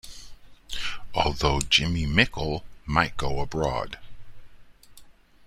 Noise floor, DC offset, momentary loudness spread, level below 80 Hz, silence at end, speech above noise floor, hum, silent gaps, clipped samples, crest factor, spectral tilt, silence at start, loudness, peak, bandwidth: -49 dBFS; under 0.1%; 16 LU; -38 dBFS; 0.35 s; 25 dB; none; none; under 0.1%; 24 dB; -4 dB/octave; 0.05 s; -25 LUFS; -4 dBFS; 15.5 kHz